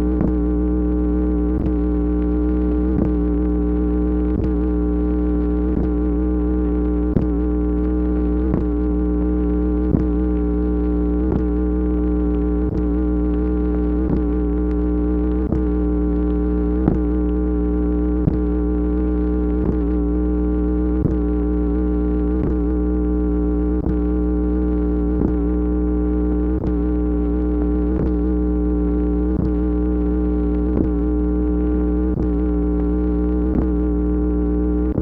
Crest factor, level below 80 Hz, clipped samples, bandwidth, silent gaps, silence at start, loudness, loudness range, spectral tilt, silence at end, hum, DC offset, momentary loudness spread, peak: 16 dB; -22 dBFS; under 0.1%; 2.9 kHz; none; 0 s; -20 LUFS; 0 LU; -12.5 dB/octave; 0 s; 60 Hz at -25 dBFS; under 0.1%; 1 LU; -2 dBFS